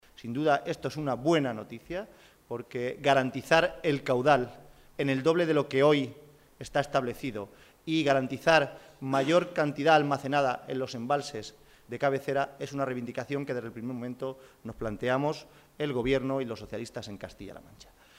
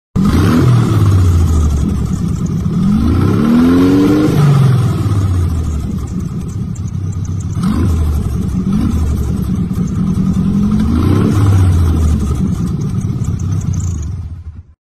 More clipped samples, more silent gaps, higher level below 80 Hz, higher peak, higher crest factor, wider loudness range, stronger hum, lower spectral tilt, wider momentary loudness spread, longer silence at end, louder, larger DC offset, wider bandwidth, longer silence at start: neither; neither; second, -58 dBFS vs -22 dBFS; second, -8 dBFS vs 0 dBFS; first, 22 dB vs 12 dB; about the same, 7 LU vs 6 LU; neither; second, -5.5 dB/octave vs -8 dB/octave; first, 17 LU vs 10 LU; about the same, 0.35 s vs 0.25 s; second, -29 LUFS vs -13 LUFS; neither; first, 16 kHz vs 14 kHz; about the same, 0.2 s vs 0.15 s